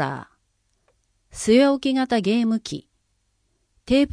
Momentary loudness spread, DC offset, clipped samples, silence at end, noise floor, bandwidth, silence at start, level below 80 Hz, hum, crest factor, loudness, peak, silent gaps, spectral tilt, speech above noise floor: 19 LU; under 0.1%; under 0.1%; 0 s; -69 dBFS; 10.5 kHz; 0 s; -52 dBFS; none; 18 dB; -21 LUFS; -4 dBFS; none; -5 dB/octave; 49 dB